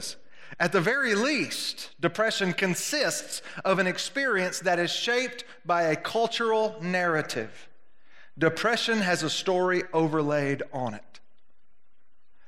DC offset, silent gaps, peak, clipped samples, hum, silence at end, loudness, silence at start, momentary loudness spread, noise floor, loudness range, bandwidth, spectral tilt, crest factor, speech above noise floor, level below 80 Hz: 0.4%; none; -8 dBFS; under 0.1%; none; 0 s; -26 LUFS; 0 s; 9 LU; -74 dBFS; 2 LU; 16 kHz; -3.5 dB/octave; 20 dB; 48 dB; -74 dBFS